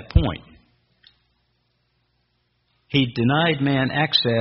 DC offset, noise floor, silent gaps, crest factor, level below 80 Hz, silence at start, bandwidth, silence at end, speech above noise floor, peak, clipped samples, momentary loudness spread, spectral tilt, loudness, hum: under 0.1%; -69 dBFS; none; 22 dB; -34 dBFS; 0 s; 5.8 kHz; 0 s; 49 dB; -2 dBFS; under 0.1%; 6 LU; -4 dB/octave; -20 LUFS; 60 Hz at -50 dBFS